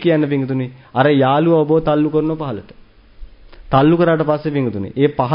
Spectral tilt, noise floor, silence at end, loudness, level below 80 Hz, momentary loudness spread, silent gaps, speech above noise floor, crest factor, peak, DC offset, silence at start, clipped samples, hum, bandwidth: -12.5 dB/octave; -37 dBFS; 0 s; -16 LUFS; -44 dBFS; 10 LU; none; 22 dB; 16 dB; 0 dBFS; under 0.1%; 0 s; under 0.1%; none; 5.4 kHz